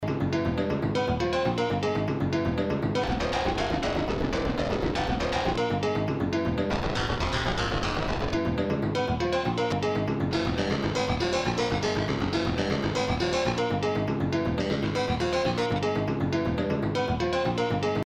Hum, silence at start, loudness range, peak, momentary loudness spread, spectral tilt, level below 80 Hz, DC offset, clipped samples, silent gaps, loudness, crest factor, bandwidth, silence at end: none; 0 s; 1 LU; -14 dBFS; 2 LU; -6 dB/octave; -40 dBFS; under 0.1%; under 0.1%; none; -27 LUFS; 14 dB; 13 kHz; 0.05 s